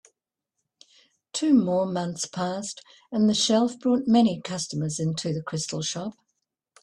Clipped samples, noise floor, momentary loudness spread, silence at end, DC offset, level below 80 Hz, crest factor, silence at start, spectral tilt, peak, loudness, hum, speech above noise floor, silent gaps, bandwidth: under 0.1%; -83 dBFS; 12 LU; 0.7 s; under 0.1%; -66 dBFS; 18 dB; 1.35 s; -5 dB/octave; -8 dBFS; -25 LUFS; none; 58 dB; none; 11.5 kHz